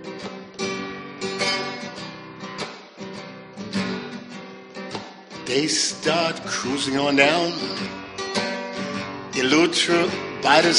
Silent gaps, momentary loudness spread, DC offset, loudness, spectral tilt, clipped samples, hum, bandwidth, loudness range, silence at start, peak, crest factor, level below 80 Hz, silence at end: none; 19 LU; under 0.1%; -23 LUFS; -3 dB/octave; under 0.1%; none; 10.5 kHz; 11 LU; 0 s; -2 dBFS; 22 dB; -62 dBFS; 0 s